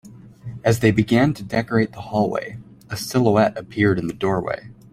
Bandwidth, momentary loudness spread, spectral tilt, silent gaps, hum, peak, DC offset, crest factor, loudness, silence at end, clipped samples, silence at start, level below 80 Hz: 16 kHz; 15 LU; -6.5 dB/octave; none; none; -2 dBFS; under 0.1%; 18 dB; -20 LUFS; 0.2 s; under 0.1%; 0.05 s; -50 dBFS